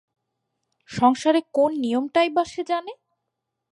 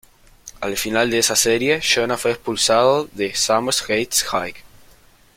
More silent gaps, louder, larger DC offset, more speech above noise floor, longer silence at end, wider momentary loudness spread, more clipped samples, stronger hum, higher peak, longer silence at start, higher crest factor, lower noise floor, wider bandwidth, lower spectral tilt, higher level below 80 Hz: neither; second, -22 LUFS vs -18 LUFS; neither; first, 60 dB vs 32 dB; about the same, 0.8 s vs 0.75 s; about the same, 8 LU vs 8 LU; neither; neither; second, -6 dBFS vs -2 dBFS; first, 0.9 s vs 0.45 s; about the same, 18 dB vs 18 dB; first, -81 dBFS vs -50 dBFS; second, 11.5 kHz vs 16.5 kHz; first, -5 dB/octave vs -2 dB/octave; second, -62 dBFS vs -50 dBFS